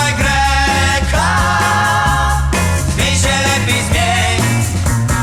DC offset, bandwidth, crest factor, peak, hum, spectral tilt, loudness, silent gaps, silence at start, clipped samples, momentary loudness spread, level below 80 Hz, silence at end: under 0.1%; 17.5 kHz; 12 dB; 0 dBFS; none; -4 dB/octave; -13 LUFS; none; 0 s; under 0.1%; 3 LU; -22 dBFS; 0 s